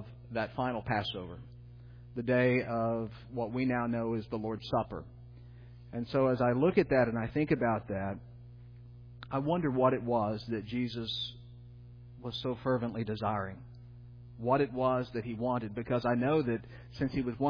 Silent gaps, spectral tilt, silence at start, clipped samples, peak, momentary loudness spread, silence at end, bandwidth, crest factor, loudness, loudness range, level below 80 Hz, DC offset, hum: none; -5.5 dB/octave; 0 s; under 0.1%; -14 dBFS; 24 LU; 0 s; 5.2 kHz; 20 dB; -32 LUFS; 5 LU; -56 dBFS; under 0.1%; 60 Hz at -50 dBFS